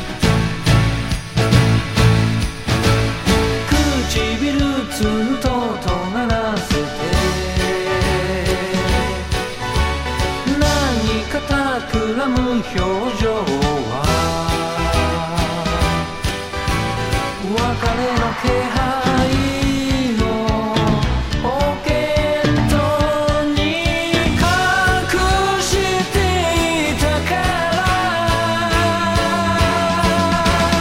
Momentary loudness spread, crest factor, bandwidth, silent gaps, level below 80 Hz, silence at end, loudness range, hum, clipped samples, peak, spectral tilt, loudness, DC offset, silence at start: 5 LU; 16 dB; 16 kHz; none; -26 dBFS; 0 s; 3 LU; none; under 0.1%; 0 dBFS; -5 dB/octave; -17 LUFS; under 0.1%; 0 s